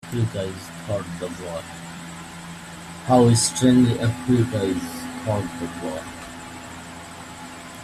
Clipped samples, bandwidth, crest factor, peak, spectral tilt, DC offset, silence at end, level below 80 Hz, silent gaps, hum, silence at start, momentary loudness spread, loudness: under 0.1%; 14 kHz; 20 dB; -4 dBFS; -5.5 dB/octave; under 0.1%; 0 s; -52 dBFS; none; none; 0.05 s; 20 LU; -22 LUFS